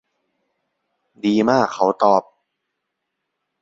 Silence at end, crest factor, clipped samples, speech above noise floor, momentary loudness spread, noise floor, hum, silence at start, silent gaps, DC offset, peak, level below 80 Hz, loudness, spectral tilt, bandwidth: 1.4 s; 20 dB; under 0.1%; 61 dB; 4 LU; -78 dBFS; none; 1.25 s; none; under 0.1%; -2 dBFS; -64 dBFS; -18 LUFS; -6 dB/octave; 7.8 kHz